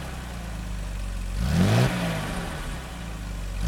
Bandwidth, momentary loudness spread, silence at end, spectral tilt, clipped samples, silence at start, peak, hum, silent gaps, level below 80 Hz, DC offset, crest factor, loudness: 17 kHz; 14 LU; 0 s; -6 dB/octave; under 0.1%; 0 s; -8 dBFS; none; none; -34 dBFS; under 0.1%; 18 dB; -28 LUFS